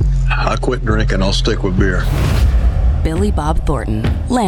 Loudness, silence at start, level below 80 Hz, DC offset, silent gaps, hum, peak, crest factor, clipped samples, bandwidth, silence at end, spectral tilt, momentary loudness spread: -16 LUFS; 0 s; -16 dBFS; under 0.1%; none; none; -4 dBFS; 10 dB; under 0.1%; 13.5 kHz; 0 s; -6 dB/octave; 3 LU